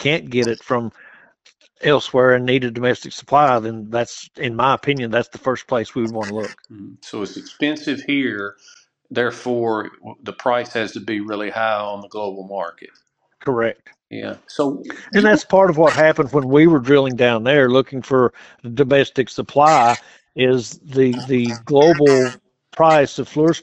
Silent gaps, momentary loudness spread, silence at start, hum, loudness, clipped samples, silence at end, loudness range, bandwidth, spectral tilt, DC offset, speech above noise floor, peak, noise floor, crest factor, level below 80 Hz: none; 16 LU; 0 s; none; -17 LUFS; under 0.1%; 0 s; 9 LU; 9.2 kHz; -5.5 dB/octave; under 0.1%; 38 dB; 0 dBFS; -55 dBFS; 18 dB; -56 dBFS